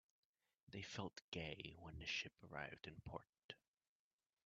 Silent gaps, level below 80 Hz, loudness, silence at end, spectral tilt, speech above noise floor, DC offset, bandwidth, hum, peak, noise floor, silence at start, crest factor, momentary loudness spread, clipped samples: 1.22-1.32 s, 3.29-3.33 s, 3.44-3.49 s; -72 dBFS; -52 LUFS; 0.9 s; -2.5 dB/octave; over 37 dB; under 0.1%; 8 kHz; none; -32 dBFS; under -90 dBFS; 0.7 s; 22 dB; 14 LU; under 0.1%